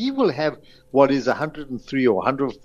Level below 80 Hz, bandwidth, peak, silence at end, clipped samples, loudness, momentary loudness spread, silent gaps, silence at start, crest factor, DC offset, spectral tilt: -52 dBFS; 7.2 kHz; -2 dBFS; 0.1 s; under 0.1%; -21 LUFS; 9 LU; none; 0 s; 18 dB; under 0.1%; -6.5 dB/octave